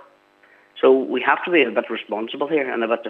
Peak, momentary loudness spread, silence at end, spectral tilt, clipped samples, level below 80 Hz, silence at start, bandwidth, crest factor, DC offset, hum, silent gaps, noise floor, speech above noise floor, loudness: -2 dBFS; 10 LU; 0 s; -7 dB/octave; under 0.1%; -82 dBFS; 0.75 s; 4.1 kHz; 18 dB; under 0.1%; none; none; -54 dBFS; 35 dB; -20 LUFS